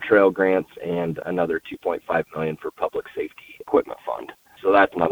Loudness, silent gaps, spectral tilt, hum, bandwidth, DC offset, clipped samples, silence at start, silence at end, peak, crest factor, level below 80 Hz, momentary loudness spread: -23 LUFS; none; -7.5 dB/octave; none; over 20 kHz; under 0.1%; under 0.1%; 0 s; 0 s; -4 dBFS; 20 dB; -58 dBFS; 14 LU